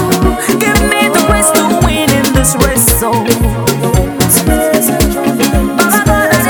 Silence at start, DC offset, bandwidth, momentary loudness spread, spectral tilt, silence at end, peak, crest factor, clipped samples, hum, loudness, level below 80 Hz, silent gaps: 0 s; under 0.1%; over 20 kHz; 4 LU; -4 dB/octave; 0 s; 0 dBFS; 10 dB; 0.1%; none; -10 LUFS; -20 dBFS; none